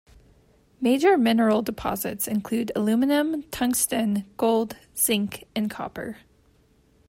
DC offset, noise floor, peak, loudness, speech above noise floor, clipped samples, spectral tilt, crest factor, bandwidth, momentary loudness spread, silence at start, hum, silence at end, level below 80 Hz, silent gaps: under 0.1%; -60 dBFS; -8 dBFS; -24 LUFS; 37 dB; under 0.1%; -4 dB/octave; 16 dB; 16.5 kHz; 11 LU; 0.8 s; none; 0.95 s; -56 dBFS; none